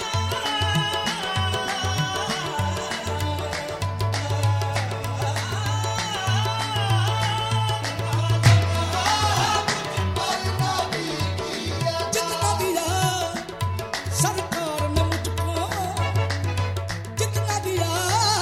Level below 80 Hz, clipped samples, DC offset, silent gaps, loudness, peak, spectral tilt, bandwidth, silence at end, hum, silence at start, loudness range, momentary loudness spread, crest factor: -44 dBFS; under 0.1%; under 0.1%; none; -24 LUFS; -4 dBFS; -4 dB/octave; 16 kHz; 0 s; none; 0 s; 4 LU; 6 LU; 20 dB